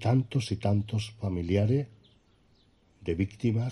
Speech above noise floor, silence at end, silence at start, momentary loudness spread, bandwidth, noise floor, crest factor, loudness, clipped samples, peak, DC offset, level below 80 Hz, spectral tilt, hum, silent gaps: 36 dB; 0 s; 0 s; 8 LU; 11 kHz; -64 dBFS; 16 dB; -30 LUFS; under 0.1%; -14 dBFS; under 0.1%; -54 dBFS; -7.5 dB/octave; none; none